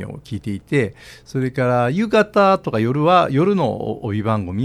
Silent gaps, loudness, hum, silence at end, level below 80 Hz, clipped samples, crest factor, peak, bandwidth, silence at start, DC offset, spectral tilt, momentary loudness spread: none; -18 LUFS; none; 0 s; -50 dBFS; under 0.1%; 18 dB; 0 dBFS; 13.5 kHz; 0 s; under 0.1%; -7.5 dB/octave; 13 LU